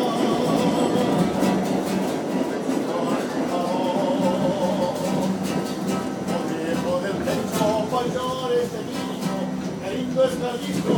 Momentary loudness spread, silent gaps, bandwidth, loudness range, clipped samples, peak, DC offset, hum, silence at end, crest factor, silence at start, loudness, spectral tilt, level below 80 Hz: 6 LU; none; 19.5 kHz; 2 LU; under 0.1%; -8 dBFS; under 0.1%; none; 0 s; 16 dB; 0 s; -24 LUFS; -5.5 dB/octave; -54 dBFS